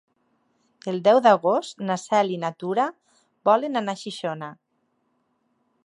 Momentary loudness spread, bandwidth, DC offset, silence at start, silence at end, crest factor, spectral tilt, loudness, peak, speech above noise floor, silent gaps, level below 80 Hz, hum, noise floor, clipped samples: 14 LU; 11.5 kHz; under 0.1%; 0.85 s; 1.3 s; 20 dB; -5 dB/octave; -23 LUFS; -4 dBFS; 49 dB; none; -80 dBFS; none; -71 dBFS; under 0.1%